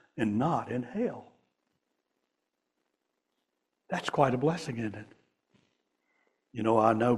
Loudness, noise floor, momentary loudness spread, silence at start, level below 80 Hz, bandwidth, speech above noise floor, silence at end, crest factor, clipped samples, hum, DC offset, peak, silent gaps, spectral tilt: -30 LUFS; -83 dBFS; 13 LU; 0.15 s; -68 dBFS; 12 kHz; 55 dB; 0 s; 22 dB; under 0.1%; none; under 0.1%; -10 dBFS; none; -7 dB/octave